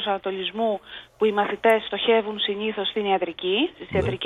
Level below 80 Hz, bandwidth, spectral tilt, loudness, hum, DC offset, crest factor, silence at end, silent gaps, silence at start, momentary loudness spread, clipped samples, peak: -52 dBFS; 13.5 kHz; -6 dB/octave; -24 LUFS; none; under 0.1%; 16 dB; 0 s; none; 0 s; 6 LU; under 0.1%; -8 dBFS